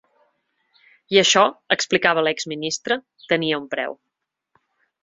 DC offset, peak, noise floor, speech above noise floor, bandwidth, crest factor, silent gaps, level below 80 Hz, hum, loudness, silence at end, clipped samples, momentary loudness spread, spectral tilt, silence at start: under 0.1%; 0 dBFS; -69 dBFS; 48 dB; 7.8 kHz; 22 dB; none; -68 dBFS; none; -20 LUFS; 1.1 s; under 0.1%; 12 LU; -2.5 dB/octave; 1.1 s